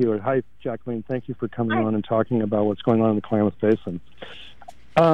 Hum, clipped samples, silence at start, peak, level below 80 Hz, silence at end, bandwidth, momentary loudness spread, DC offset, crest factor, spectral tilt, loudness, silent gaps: none; under 0.1%; 0 s; -4 dBFS; -56 dBFS; 0 s; 6.8 kHz; 17 LU; 0.8%; 18 dB; -9 dB/octave; -23 LUFS; none